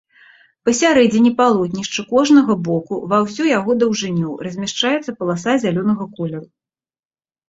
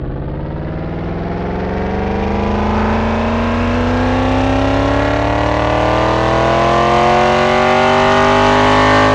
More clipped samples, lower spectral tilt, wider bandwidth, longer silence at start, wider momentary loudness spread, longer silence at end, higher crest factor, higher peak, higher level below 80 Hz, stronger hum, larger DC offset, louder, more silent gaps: neither; about the same, -5 dB/octave vs -6 dB/octave; second, 8 kHz vs 10.5 kHz; first, 0.65 s vs 0 s; about the same, 11 LU vs 11 LU; first, 1.05 s vs 0 s; about the same, 16 dB vs 12 dB; about the same, -2 dBFS vs 0 dBFS; second, -58 dBFS vs -26 dBFS; neither; neither; second, -17 LUFS vs -14 LUFS; neither